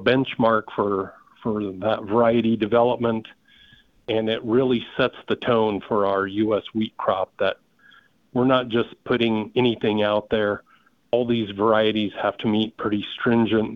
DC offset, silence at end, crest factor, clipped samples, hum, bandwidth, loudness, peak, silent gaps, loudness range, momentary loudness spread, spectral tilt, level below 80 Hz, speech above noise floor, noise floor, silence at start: under 0.1%; 0 s; 18 dB; under 0.1%; none; 5.4 kHz; -22 LUFS; -4 dBFS; none; 2 LU; 7 LU; -8.5 dB/octave; -56 dBFS; 33 dB; -55 dBFS; 0 s